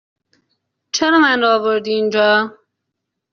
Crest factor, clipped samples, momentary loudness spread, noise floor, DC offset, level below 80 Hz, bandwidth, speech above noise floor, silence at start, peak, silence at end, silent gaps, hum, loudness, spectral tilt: 16 dB; under 0.1%; 7 LU; -77 dBFS; under 0.1%; -64 dBFS; 7.2 kHz; 63 dB; 0.95 s; -2 dBFS; 0.8 s; none; none; -15 LUFS; -1 dB/octave